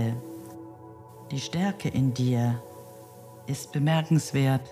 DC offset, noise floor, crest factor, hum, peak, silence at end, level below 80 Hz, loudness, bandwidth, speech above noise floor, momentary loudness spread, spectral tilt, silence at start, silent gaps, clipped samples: under 0.1%; -47 dBFS; 16 dB; none; -12 dBFS; 0 s; -62 dBFS; -27 LUFS; 15.5 kHz; 21 dB; 22 LU; -6.5 dB/octave; 0 s; none; under 0.1%